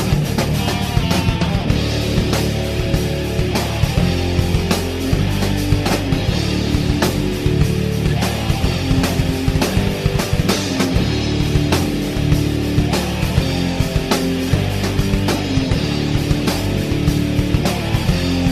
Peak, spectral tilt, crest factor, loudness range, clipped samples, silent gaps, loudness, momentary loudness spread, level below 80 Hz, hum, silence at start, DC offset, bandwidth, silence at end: -2 dBFS; -5.5 dB/octave; 16 dB; 1 LU; under 0.1%; none; -18 LUFS; 2 LU; -26 dBFS; none; 0 s; under 0.1%; 14 kHz; 0 s